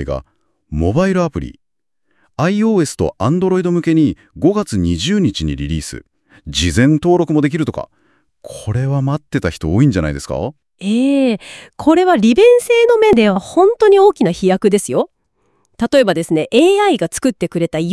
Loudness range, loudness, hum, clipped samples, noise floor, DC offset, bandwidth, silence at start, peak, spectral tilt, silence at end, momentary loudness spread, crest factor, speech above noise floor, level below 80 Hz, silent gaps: 6 LU; -14 LUFS; none; under 0.1%; -74 dBFS; under 0.1%; 12 kHz; 0 s; 0 dBFS; -6 dB/octave; 0 s; 14 LU; 14 dB; 60 dB; -38 dBFS; none